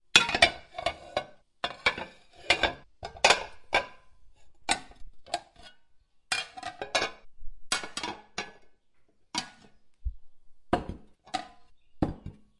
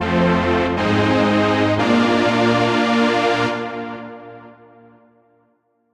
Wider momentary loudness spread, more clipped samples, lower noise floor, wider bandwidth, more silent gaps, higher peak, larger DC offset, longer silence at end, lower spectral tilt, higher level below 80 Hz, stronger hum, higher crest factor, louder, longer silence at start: first, 21 LU vs 13 LU; neither; about the same, -61 dBFS vs -63 dBFS; about the same, 11.5 kHz vs 11 kHz; neither; about the same, -2 dBFS vs -4 dBFS; neither; second, 0.3 s vs 1.4 s; second, -2 dB/octave vs -6 dB/octave; about the same, -50 dBFS vs -48 dBFS; neither; first, 30 dB vs 14 dB; second, -29 LUFS vs -17 LUFS; first, 0.15 s vs 0 s